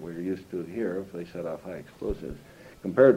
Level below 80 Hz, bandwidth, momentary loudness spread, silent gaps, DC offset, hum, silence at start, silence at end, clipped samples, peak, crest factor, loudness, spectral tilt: -50 dBFS; 15 kHz; 10 LU; none; under 0.1%; none; 0 s; 0 s; under 0.1%; -6 dBFS; 22 dB; -32 LUFS; -8 dB/octave